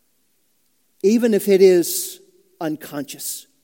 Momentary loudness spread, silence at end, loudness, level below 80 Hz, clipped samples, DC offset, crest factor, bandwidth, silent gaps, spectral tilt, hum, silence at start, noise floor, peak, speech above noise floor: 16 LU; 0.2 s; -19 LUFS; -80 dBFS; under 0.1%; under 0.1%; 18 dB; 17 kHz; none; -4.5 dB/octave; none; 1.05 s; -67 dBFS; -2 dBFS; 49 dB